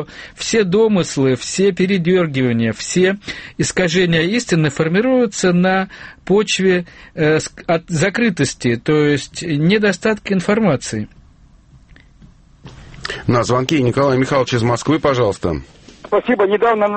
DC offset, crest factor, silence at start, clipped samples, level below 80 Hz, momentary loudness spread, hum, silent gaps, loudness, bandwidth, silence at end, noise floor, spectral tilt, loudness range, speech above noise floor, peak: under 0.1%; 16 dB; 0 s; under 0.1%; -44 dBFS; 8 LU; none; none; -16 LUFS; 8.8 kHz; 0 s; -47 dBFS; -5.5 dB/octave; 4 LU; 31 dB; 0 dBFS